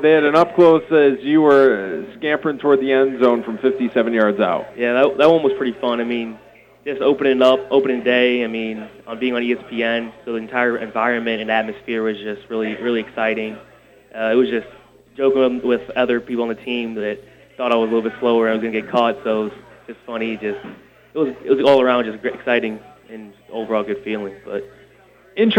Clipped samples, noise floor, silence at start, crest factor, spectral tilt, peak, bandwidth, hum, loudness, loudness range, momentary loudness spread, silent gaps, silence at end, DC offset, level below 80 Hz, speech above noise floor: under 0.1%; -50 dBFS; 0 s; 16 dB; -6.5 dB/octave; -2 dBFS; 8.4 kHz; none; -18 LUFS; 5 LU; 16 LU; none; 0 s; under 0.1%; -58 dBFS; 32 dB